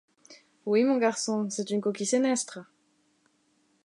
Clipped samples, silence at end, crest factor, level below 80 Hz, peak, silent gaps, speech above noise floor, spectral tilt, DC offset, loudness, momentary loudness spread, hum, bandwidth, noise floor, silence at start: under 0.1%; 1.2 s; 16 dB; -84 dBFS; -12 dBFS; none; 42 dB; -4 dB/octave; under 0.1%; -27 LUFS; 12 LU; none; 11.5 kHz; -69 dBFS; 0.3 s